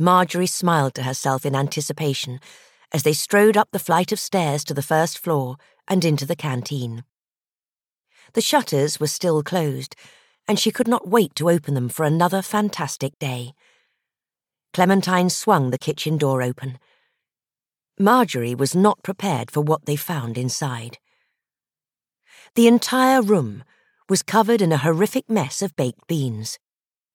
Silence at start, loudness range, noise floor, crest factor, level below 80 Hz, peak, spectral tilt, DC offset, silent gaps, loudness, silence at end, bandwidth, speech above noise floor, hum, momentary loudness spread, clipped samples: 0 s; 4 LU; under -90 dBFS; 20 dB; -72 dBFS; -2 dBFS; -5 dB/octave; under 0.1%; 7.21-7.25 s, 7.68-7.73 s; -20 LUFS; 0.6 s; 18 kHz; over 70 dB; none; 12 LU; under 0.1%